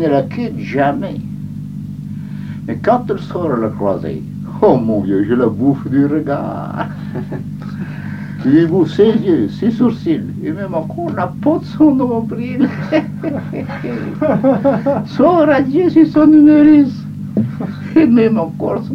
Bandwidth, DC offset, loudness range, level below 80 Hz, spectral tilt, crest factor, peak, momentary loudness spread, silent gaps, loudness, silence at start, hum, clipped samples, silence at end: 6.2 kHz; under 0.1%; 8 LU; -46 dBFS; -9 dB/octave; 14 dB; 0 dBFS; 15 LU; none; -14 LUFS; 0 s; 50 Hz at -45 dBFS; under 0.1%; 0 s